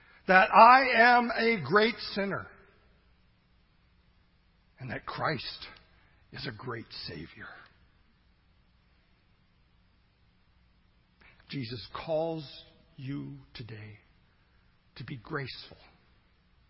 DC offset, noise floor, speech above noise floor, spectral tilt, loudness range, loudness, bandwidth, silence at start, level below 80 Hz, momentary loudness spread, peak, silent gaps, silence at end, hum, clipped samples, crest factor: under 0.1%; -66 dBFS; 38 dB; -8.5 dB/octave; 21 LU; -26 LUFS; 5.8 kHz; 0.3 s; -62 dBFS; 27 LU; -4 dBFS; none; 0.95 s; none; under 0.1%; 26 dB